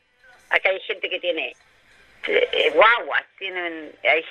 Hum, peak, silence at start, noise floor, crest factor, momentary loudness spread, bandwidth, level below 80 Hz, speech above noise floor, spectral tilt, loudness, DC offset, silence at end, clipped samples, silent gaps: none; -2 dBFS; 0.5 s; -54 dBFS; 22 dB; 14 LU; 9.4 kHz; -66 dBFS; 33 dB; -2.5 dB/octave; -21 LUFS; under 0.1%; 0 s; under 0.1%; none